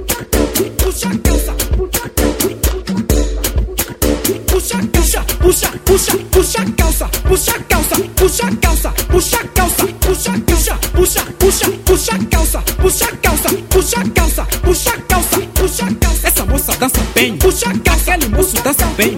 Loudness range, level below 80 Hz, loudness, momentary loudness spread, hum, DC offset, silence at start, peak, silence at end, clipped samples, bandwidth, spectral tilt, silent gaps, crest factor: 3 LU; -18 dBFS; -14 LUFS; 4 LU; none; under 0.1%; 0 s; 0 dBFS; 0 s; under 0.1%; 17 kHz; -4 dB/octave; none; 14 dB